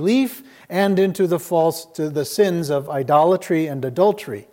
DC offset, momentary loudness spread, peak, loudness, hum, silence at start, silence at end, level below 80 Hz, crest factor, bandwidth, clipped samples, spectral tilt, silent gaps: under 0.1%; 9 LU; -4 dBFS; -20 LUFS; none; 0 s; 0.1 s; -70 dBFS; 16 dB; 17 kHz; under 0.1%; -6 dB/octave; none